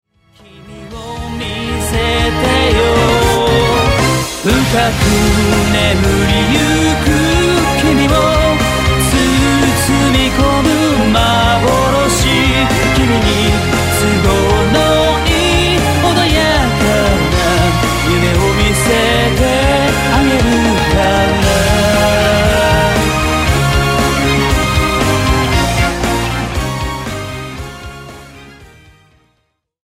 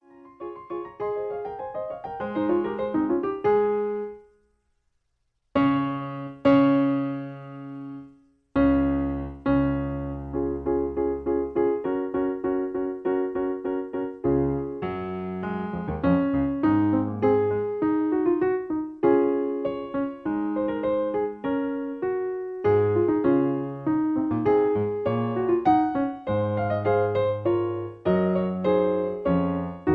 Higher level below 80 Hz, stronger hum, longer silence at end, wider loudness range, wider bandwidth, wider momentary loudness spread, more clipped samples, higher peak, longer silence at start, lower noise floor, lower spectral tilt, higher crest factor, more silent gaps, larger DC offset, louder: first, -22 dBFS vs -48 dBFS; neither; first, 1.25 s vs 0 s; about the same, 4 LU vs 4 LU; first, 16.5 kHz vs 4.8 kHz; second, 7 LU vs 10 LU; neither; first, 0 dBFS vs -8 dBFS; first, 0.55 s vs 0.25 s; second, -64 dBFS vs -74 dBFS; second, -4.5 dB/octave vs -10.5 dB/octave; second, 12 dB vs 18 dB; neither; neither; first, -12 LUFS vs -25 LUFS